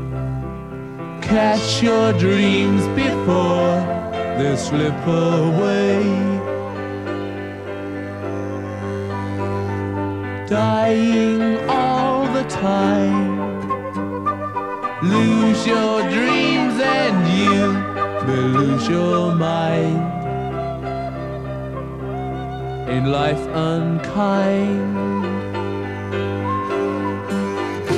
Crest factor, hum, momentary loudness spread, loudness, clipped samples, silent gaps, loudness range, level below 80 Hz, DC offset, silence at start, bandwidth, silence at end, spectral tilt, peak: 14 dB; none; 11 LU; -20 LUFS; under 0.1%; none; 7 LU; -44 dBFS; 0.2%; 0 s; 11.5 kHz; 0 s; -6.5 dB/octave; -4 dBFS